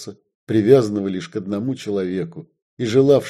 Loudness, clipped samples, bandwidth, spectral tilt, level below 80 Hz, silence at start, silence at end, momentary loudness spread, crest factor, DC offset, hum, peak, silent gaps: -20 LUFS; under 0.1%; 13 kHz; -7 dB/octave; -58 dBFS; 0 s; 0 s; 15 LU; 18 dB; under 0.1%; none; 0 dBFS; 0.35-0.47 s, 2.62-2.77 s